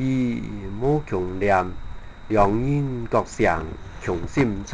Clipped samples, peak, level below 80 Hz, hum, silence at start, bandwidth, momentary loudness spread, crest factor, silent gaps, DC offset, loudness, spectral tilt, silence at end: under 0.1%; -4 dBFS; -36 dBFS; none; 0 s; 9.6 kHz; 12 LU; 20 dB; none; 0.4%; -23 LUFS; -7.5 dB/octave; 0 s